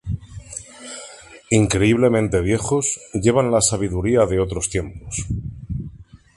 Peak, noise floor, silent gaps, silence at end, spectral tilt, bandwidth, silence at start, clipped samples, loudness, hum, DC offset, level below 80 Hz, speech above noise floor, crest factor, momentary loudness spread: -2 dBFS; -41 dBFS; none; 0.2 s; -5 dB/octave; 11.5 kHz; 0.05 s; under 0.1%; -19 LUFS; none; under 0.1%; -36 dBFS; 23 dB; 18 dB; 18 LU